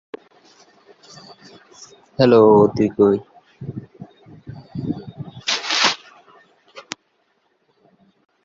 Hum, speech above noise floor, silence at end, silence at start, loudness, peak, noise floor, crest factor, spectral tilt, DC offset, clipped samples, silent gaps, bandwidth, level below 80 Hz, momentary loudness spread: none; 51 dB; 1.65 s; 0.15 s; -17 LUFS; -2 dBFS; -65 dBFS; 20 dB; -4.5 dB/octave; under 0.1%; under 0.1%; none; 7.8 kHz; -56 dBFS; 26 LU